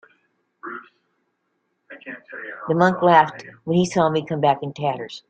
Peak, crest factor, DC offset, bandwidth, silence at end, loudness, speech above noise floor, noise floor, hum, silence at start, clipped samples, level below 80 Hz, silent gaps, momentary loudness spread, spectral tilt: -2 dBFS; 20 dB; under 0.1%; 9 kHz; 0.1 s; -19 LUFS; 52 dB; -72 dBFS; none; 0.65 s; under 0.1%; -64 dBFS; none; 22 LU; -6 dB/octave